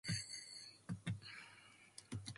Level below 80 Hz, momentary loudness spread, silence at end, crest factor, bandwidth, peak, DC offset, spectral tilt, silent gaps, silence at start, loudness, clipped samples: -68 dBFS; 15 LU; 0 s; 20 dB; 11.5 kHz; -30 dBFS; under 0.1%; -3.5 dB/octave; none; 0.05 s; -50 LUFS; under 0.1%